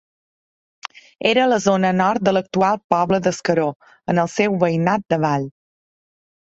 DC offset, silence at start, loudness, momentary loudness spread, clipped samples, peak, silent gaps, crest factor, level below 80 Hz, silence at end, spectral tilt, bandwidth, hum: under 0.1%; 0.85 s; -19 LUFS; 16 LU; under 0.1%; -2 dBFS; 2.84-2.89 s, 3.76-3.80 s; 18 dB; -58 dBFS; 1 s; -5.5 dB/octave; 8 kHz; none